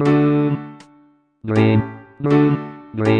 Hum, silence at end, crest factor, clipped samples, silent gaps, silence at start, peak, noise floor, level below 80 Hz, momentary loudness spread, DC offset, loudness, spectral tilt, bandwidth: none; 0 s; 14 dB; under 0.1%; none; 0 s; -4 dBFS; -54 dBFS; -52 dBFS; 16 LU; under 0.1%; -18 LUFS; -9 dB/octave; 8.8 kHz